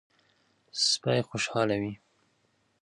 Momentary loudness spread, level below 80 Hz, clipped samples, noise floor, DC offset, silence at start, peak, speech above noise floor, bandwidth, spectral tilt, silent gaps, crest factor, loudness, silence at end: 13 LU; -66 dBFS; under 0.1%; -71 dBFS; under 0.1%; 0.75 s; -12 dBFS; 43 dB; 11.5 kHz; -3.5 dB/octave; none; 20 dB; -28 LUFS; 0.85 s